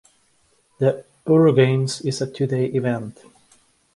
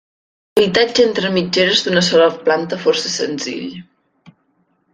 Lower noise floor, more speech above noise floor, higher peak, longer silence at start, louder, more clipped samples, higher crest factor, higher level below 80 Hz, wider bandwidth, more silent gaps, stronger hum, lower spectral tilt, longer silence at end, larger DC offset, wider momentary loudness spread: about the same, -62 dBFS vs -62 dBFS; second, 43 dB vs 47 dB; about the same, -2 dBFS vs -2 dBFS; first, 0.8 s vs 0.55 s; second, -20 LUFS vs -15 LUFS; neither; about the same, 18 dB vs 16 dB; second, -62 dBFS vs -56 dBFS; second, 11.5 kHz vs 14.5 kHz; neither; neither; first, -6.5 dB/octave vs -3.5 dB/octave; second, 0.85 s vs 1.1 s; neither; about the same, 12 LU vs 10 LU